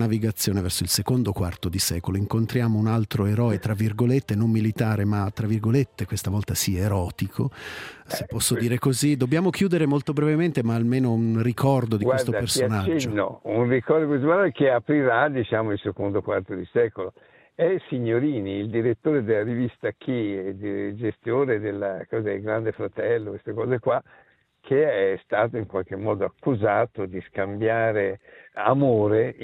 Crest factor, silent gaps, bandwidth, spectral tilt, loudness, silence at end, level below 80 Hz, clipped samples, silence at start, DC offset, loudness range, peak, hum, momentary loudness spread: 20 dB; none; 16 kHz; -6 dB/octave; -24 LUFS; 0 s; -56 dBFS; under 0.1%; 0 s; under 0.1%; 4 LU; -4 dBFS; none; 8 LU